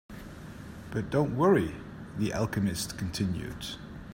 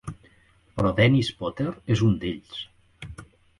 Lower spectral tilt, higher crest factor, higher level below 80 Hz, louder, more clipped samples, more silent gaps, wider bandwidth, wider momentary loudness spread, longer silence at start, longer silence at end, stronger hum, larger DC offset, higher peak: about the same, -6 dB/octave vs -7 dB/octave; about the same, 20 dB vs 20 dB; about the same, -50 dBFS vs -46 dBFS; second, -30 LUFS vs -24 LUFS; neither; neither; first, 16 kHz vs 11.5 kHz; about the same, 20 LU vs 22 LU; about the same, 0.1 s vs 0.05 s; second, 0 s vs 0.35 s; neither; neither; second, -12 dBFS vs -6 dBFS